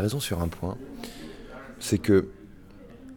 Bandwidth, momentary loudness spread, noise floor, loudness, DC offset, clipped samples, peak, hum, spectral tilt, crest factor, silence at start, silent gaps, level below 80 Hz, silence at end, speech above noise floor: 19 kHz; 23 LU; -47 dBFS; -27 LUFS; under 0.1%; under 0.1%; -10 dBFS; none; -5.5 dB/octave; 20 dB; 0 s; none; -48 dBFS; 0 s; 21 dB